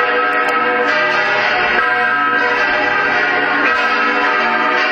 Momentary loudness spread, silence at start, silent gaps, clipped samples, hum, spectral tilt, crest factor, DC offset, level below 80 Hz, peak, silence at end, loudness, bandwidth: 1 LU; 0 s; none; under 0.1%; none; -3.5 dB/octave; 12 dB; under 0.1%; -52 dBFS; -2 dBFS; 0 s; -13 LUFS; 16.5 kHz